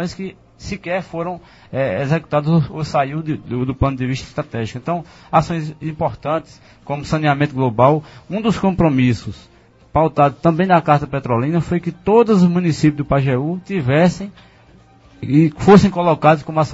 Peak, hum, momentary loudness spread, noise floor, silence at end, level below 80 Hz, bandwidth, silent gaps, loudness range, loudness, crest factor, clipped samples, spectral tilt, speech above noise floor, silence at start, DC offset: 0 dBFS; none; 13 LU; -47 dBFS; 0 s; -42 dBFS; 8 kHz; none; 6 LU; -17 LUFS; 16 dB; under 0.1%; -7.5 dB/octave; 31 dB; 0 s; under 0.1%